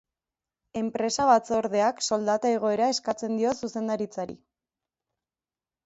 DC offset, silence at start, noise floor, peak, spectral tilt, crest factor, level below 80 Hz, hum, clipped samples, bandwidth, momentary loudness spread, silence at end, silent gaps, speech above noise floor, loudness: under 0.1%; 0.75 s; under -90 dBFS; -8 dBFS; -4 dB/octave; 20 dB; -66 dBFS; none; under 0.1%; 8.2 kHz; 11 LU; 1.5 s; none; over 64 dB; -26 LUFS